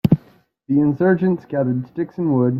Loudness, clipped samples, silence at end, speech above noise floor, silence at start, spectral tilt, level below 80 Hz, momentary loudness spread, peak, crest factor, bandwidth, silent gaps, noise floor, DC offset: -19 LUFS; under 0.1%; 0 s; 35 dB; 0.05 s; -10.5 dB/octave; -52 dBFS; 7 LU; -2 dBFS; 16 dB; 15.5 kHz; none; -53 dBFS; under 0.1%